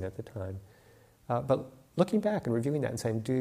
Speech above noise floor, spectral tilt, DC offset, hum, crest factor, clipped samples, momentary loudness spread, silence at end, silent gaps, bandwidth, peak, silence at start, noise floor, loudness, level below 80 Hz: 29 dB; -7 dB/octave; under 0.1%; none; 20 dB; under 0.1%; 12 LU; 0 s; none; 15.5 kHz; -12 dBFS; 0 s; -60 dBFS; -32 LUFS; -62 dBFS